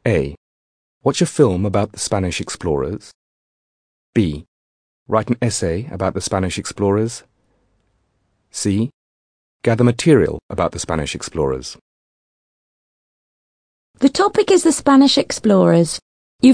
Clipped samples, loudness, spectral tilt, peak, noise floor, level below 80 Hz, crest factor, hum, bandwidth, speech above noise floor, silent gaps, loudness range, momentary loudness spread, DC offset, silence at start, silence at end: under 0.1%; -18 LUFS; -5.5 dB/octave; 0 dBFS; -66 dBFS; -44 dBFS; 18 dB; none; 10.5 kHz; 49 dB; 0.37-1.01 s, 3.15-4.13 s, 4.48-5.06 s, 8.94-9.60 s, 10.42-10.49 s, 11.81-13.94 s, 16.02-16.39 s; 8 LU; 11 LU; under 0.1%; 0.05 s; 0 s